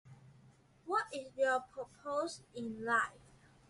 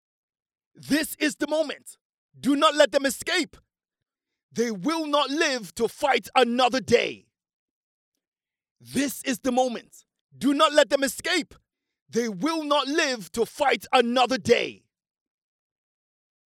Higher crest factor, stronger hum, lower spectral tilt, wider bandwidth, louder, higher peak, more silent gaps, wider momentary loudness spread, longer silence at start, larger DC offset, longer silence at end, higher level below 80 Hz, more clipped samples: about the same, 20 dB vs 22 dB; neither; about the same, -3.5 dB/octave vs -3 dB/octave; second, 11.5 kHz vs 17 kHz; second, -37 LUFS vs -24 LUFS; second, -20 dBFS vs -4 dBFS; second, none vs 2.01-2.29 s, 4.43-4.49 s, 7.53-8.12 s, 8.27-8.32 s, 8.71-8.76 s, 10.21-10.29 s, 12.02-12.06 s; about the same, 12 LU vs 10 LU; second, 0.05 s vs 0.8 s; neither; second, 0.5 s vs 1.8 s; second, -74 dBFS vs -62 dBFS; neither